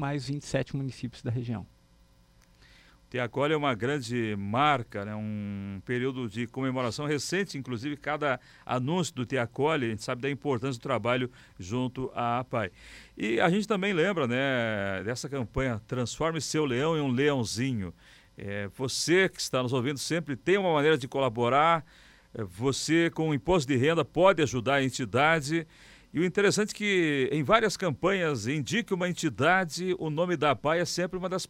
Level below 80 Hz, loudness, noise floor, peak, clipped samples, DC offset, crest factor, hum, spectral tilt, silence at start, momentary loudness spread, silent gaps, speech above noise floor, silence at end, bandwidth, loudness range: -56 dBFS; -28 LUFS; -61 dBFS; -6 dBFS; under 0.1%; under 0.1%; 22 dB; none; -5 dB/octave; 0 s; 11 LU; none; 32 dB; 0.05 s; 16 kHz; 5 LU